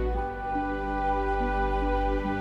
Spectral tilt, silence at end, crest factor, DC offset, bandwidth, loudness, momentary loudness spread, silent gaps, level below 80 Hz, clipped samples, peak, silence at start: -8 dB/octave; 0 s; 12 dB; under 0.1%; 6.2 kHz; -29 LUFS; 3 LU; none; -32 dBFS; under 0.1%; -16 dBFS; 0 s